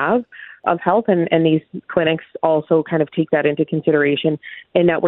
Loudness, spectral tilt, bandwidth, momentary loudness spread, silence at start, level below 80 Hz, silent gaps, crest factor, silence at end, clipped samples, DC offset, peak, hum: -18 LUFS; -10.5 dB/octave; 4.1 kHz; 6 LU; 0 s; -60 dBFS; none; 16 dB; 0 s; under 0.1%; under 0.1%; 0 dBFS; none